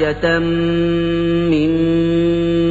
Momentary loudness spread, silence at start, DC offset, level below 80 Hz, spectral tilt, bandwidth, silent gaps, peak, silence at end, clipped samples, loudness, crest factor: 2 LU; 0 s; under 0.1%; -34 dBFS; -8 dB/octave; 7.8 kHz; none; -4 dBFS; 0 s; under 0.1%; -16 LUFS; 12 dB